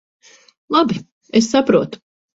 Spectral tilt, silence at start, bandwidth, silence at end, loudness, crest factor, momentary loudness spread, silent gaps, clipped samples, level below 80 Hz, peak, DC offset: -5 dB/octave; 0.7 s; 8 kHz; 0.4 s; -17 LUFS; 18 dB; 13 LU; 1.12-1.21 s; under 0.1%; -56 dBFS; 0 dBFS; under 0.1%